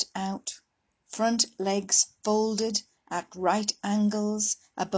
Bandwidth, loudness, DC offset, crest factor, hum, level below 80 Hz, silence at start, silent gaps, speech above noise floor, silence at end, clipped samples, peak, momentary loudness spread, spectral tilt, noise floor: 8 kHz; -27 LUFS; under 0.1%; 20 dB; none; -70 dBFS; 0 s; none; 42 dB; 0 s; under 0.1%; -10 dBFS; 12 LU; -3 dB/octave; -69 dBFS